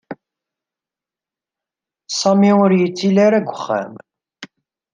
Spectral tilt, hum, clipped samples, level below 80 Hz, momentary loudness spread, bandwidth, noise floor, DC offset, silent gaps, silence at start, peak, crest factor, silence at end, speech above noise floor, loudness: -6 dB/octave; none; under 0.1%; -68 dBFS; 19 LU; 9.4 kHz; -89 dBFS; under 0.1%; none; 0.1 s; -2 dBFS; 16 dB; 0.5 s; 74 dB; -15 LUFS